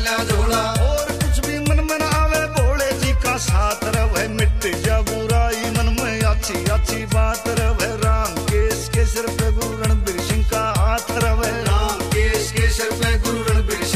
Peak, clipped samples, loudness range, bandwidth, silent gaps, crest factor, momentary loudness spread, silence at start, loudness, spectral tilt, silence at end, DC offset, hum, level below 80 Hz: -6 dBFS; under 0.1%; 1 LU; 15.5 kHz; none; 12 dB; 2 LU; 0 s; -19 LUFS; -4.5 dB/octave; 0 s; under 0.1%; none; -22 dBFS